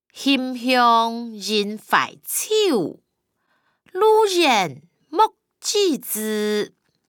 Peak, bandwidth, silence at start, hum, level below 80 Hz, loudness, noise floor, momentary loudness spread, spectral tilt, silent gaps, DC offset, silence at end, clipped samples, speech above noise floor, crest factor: -4 dBFS; over 20 kHz; 0.15 s; none; -76 dBFS; -20 LUFS; -71 dBFS; 12 LU; -2.5 dB/octave; none; under 0.1%; 0.4 s; under 0.1%; 51 dB; 18 dB